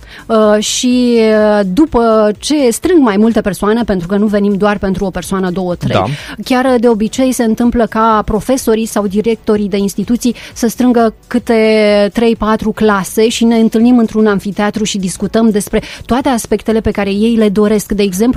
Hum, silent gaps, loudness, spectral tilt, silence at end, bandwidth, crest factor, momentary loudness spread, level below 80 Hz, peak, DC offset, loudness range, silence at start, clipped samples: none; none; -12 LUFS; -5 dB/octave; 0 s; 15 kHz; 12 dB; 6 LU; -34 dBFS; 0 dBFS; under 0.1%; 3 LU; 0 s; under 0.1%